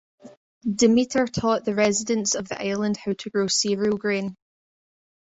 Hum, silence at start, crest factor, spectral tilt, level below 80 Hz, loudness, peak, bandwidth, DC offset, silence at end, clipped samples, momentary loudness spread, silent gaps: none; 0.25 s; 18 dB; -3.5 dB/octave; -58 dBFS; -23 LUFS; -6 dBFS; 8 kHz; under 0.1%; 0.9 s; under 0.1%; 9 LU; 0.37-0.61 s